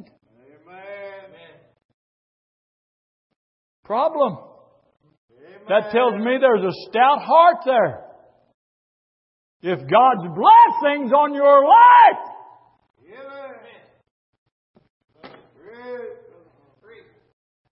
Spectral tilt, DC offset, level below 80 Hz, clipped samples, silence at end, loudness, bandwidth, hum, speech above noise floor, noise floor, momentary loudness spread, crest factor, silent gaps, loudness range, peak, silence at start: -9.5 dB/octave; under 0.1%; -74 dBFS; under 0.1%; 1.6 s; -15 LUFS; 5.8 kHz; none; 41 dB; -55 dBFS; 26 LU; 18 dB; 1.85-3.30 s, 3.36-3.83 s, 5.17-5.28 s, 8.54-9.60 s, 14.11-14.46 s, 14.52-14.74 s, 14.90-15.00 s; 15 LU; -2 dBFS; 0.85 s